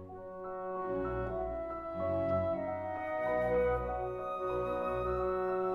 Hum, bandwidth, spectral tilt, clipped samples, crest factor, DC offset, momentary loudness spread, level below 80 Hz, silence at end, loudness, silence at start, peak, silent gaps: none; 12 kHz; -9 dB/octave; under 0.1%; 14 dB; under 0.1%; 8 LU; -50 dBFS; 0 s; -35 LUFS; 0 s; -22 dBFS; none